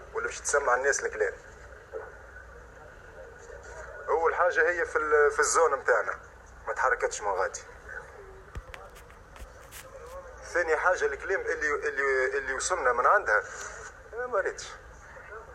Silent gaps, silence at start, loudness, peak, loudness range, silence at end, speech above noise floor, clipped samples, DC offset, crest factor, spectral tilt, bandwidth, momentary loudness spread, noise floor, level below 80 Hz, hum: none; 0 s; -27 LUFS; -10 dBFS; 10 LU; 0 s; 22 dB; under 0.1%; under 0.1%; 20 dB; -2 dB/octave; 15 kHz; 24 LU; -49 dBFS; -52 dBFS; none